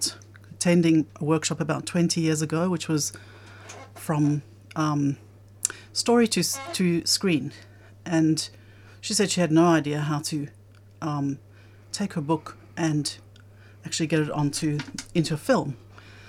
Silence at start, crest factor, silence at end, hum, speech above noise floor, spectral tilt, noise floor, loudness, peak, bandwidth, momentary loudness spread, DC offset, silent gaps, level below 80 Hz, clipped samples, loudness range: 0 s; 22 dB; 0 s; none; 25 dB; -4.5 dB/octave; -49 dBFS; -25 LUFS; -4 dBFS; 16 kHz; 17 LU; under 0.1%; none; -62 dBFS; under 0.1%; 5 LU